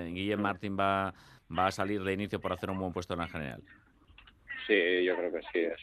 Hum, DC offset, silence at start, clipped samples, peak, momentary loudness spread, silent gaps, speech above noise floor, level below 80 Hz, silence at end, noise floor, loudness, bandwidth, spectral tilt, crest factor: none; under 0.1%; 0 s; under 0.1%; -12 dBFS; 11 LU; none; 27 dB; -64 dBFS; 0 s; -59 dBFS; -32 LUFS; 13 kHz; -6 dB/octave; 20 dB